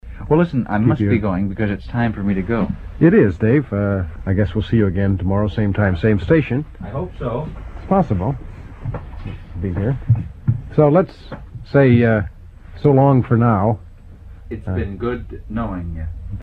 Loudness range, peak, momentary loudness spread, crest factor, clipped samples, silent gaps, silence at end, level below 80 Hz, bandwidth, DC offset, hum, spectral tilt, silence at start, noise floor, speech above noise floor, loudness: 6 LU; 0 dBFS; 16 LU; 18 dB; under 0.1%; none; 0 s; -34 dBFS; 4.9 kHz; under 0.1%; none; -10.5 dB/octave; 0.05 s; -38 dBFS; 21 dB; -18 LUFS